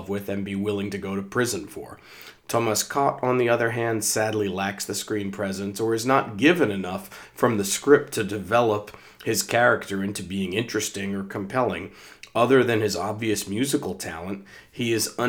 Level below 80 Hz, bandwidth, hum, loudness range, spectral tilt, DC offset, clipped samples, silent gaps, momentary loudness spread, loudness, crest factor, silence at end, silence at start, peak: -64 dBFS; over 20 kHz; none; 3 LU; -4 dB/octave; under 0.1%; under 0.1%; none; 14 LU; -24 LUFS; 22 dB; 0 s; 0 s; -4 dBFS